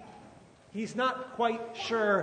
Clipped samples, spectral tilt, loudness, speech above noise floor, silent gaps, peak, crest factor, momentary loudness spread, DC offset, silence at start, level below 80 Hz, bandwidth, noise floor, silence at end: under 0.1%; -4.5 dB/octave; -31 LUFS; 25 dB; none; -16 dBFS; 18 dB; 17 LU; under 0.1%; 0 s; -72 dBFS; 9.6 kHz; -55 dBFS; 0 s